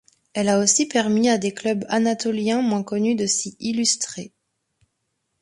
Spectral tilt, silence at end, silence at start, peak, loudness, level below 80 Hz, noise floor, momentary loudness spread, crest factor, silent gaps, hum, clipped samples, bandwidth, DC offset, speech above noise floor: -3.5 dB/octave; 1.15 s; 0.35 s; -6 dBFS; -21 LUFS; -64 dBFS; -75 dBFS; 8 LU; 18 dB; none; none; under 0.1%; 11.5 kHz; under 0.1%; 54 dB